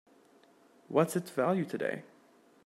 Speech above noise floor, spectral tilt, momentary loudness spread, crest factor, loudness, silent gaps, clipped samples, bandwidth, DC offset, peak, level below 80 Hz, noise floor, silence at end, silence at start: 32 dB; -6.5 dB/octave; 7 LU; 22 dB; -32 LUFS; none; under 0.1%; 16 kHz; under 0.1%; -12 dBFS; -84 dBFS; -63 dBFS; 0.6 s; 0.9 s